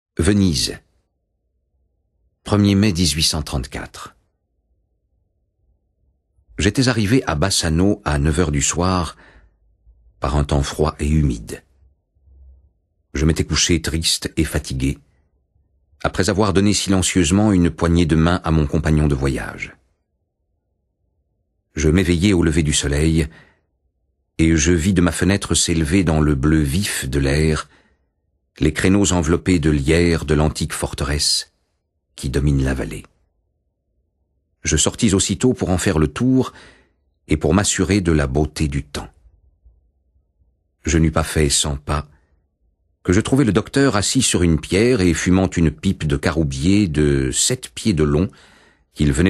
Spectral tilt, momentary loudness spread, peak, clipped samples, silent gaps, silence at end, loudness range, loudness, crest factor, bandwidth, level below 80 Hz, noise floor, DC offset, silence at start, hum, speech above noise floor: -5 dB/octave; 10 LU; -2 dBFS; under 0.1%; none; 0 s; 6 LU; -18 LUFS; 18 dB; 13 kHz; -30 dBFS; -71 dBFS; under 0.1%; 0.2 s; none; 53 dB